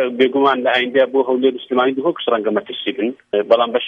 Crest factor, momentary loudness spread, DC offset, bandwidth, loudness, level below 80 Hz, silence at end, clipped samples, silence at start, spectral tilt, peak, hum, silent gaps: 16 dB; 7 LU; under 0.1%; 5.4 kHz; -17 LUFS; -68 dBFS; 0 s; under 0.1%; 0 s; -6 dB/octave; 0 dBFS; none; none